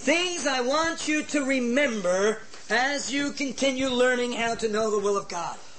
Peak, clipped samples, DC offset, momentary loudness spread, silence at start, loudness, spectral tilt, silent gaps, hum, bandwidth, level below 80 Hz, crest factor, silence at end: -10 dBFS; under 0.1%; 0.9%; 4 LU; 0 s; -25 LUFS; -2.5 dB/octave; none; none; 8.8 kHz; -60 dBFS; 16 dB; 0.05 s